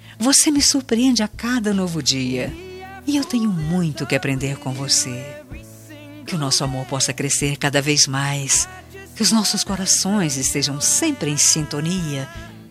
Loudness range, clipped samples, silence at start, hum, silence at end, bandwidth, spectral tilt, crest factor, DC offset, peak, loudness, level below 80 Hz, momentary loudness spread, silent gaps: 4 LU; under 0.1%; 0.05 s; none; 0 s; 15 kHz; -3 dB/octave; 20 dB; under 0.1%; -2 dBFS; -18 LUFS; -46 dBFS; 17 LU; none